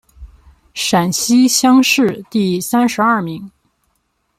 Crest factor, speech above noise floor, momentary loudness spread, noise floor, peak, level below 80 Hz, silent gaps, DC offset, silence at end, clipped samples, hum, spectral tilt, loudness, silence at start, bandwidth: 14 dB; 52 dB; 11 LU; -65 dBFS; 0 dBFS; -48 dBFS; none; under 0.1%; 0.9 s; under 0.1%; none; -3.5 dB/octave; -13 LUFS; 0.2 s; 16 kHz